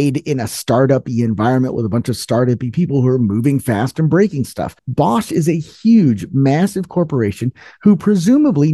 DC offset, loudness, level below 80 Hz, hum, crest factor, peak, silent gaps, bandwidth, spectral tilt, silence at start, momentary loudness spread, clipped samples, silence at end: under 0.1%; -16 LUFS; -50 dBFS; none; 14 dB; 0 dBFS; none; 12.5 kHz; -7.5 dB/octave; 0 s; 7 LU; under 0.1%; 0 s